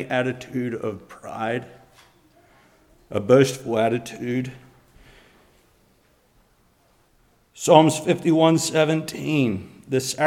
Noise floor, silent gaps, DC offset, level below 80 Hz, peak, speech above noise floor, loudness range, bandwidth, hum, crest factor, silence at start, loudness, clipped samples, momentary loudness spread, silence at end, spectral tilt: -61 dBFS; none; under 0.1%; -62 dBFS; 0 dBFS; 40 dB; 11 LU; 16.5 kHz; none; 24 dB; 0 s; -21 LUFS; under 0.1%; 14 LU; 0 s; -5 dB/octave